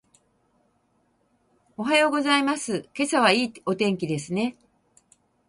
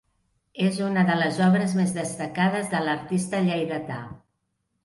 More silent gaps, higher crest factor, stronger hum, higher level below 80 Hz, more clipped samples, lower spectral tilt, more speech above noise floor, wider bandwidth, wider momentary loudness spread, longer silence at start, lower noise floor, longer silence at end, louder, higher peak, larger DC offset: neither; first, 22 dB vs 16 dB; neither; about the same, -68 dBFS vs -64 dBFS; neither; second, -4 dB/octave vs -6 dB/octave; second, 44 dB vs 52 dB; about the same, 11.5 kHz vs 11.5 kHz; about the same, 10 LU vs 11 LU; first, 1.8 s vs 0.55 s; second, -68 dBFS vs -76 dBFS; first, 0.95 s vs 0.65 s; about the same, -23 LUFS vs -24 LUFS; first, -4 dBFS vs -8 dBFS; neither